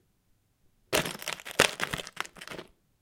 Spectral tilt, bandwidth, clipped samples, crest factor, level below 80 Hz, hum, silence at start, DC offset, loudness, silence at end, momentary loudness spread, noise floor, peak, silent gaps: -2 dB/octave; 17 kHz; under 0.1%; 32 dB; -58 dBFS; none; 0.9 s; under 0.1%; -30 LUFS; 0.4 s; 18 LU; -70 dBFS; -2 dBFS; none